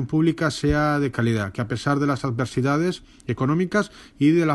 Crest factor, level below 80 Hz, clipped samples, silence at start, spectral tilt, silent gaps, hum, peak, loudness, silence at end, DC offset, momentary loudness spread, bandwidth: 16 dB; -42 dBFS; under 0.1%; 0 s; -6.5 dB/octave; none; none; -6 dBFS; -23 LUFS; 0 s; under 0.1%; 6 LU; 12 kHz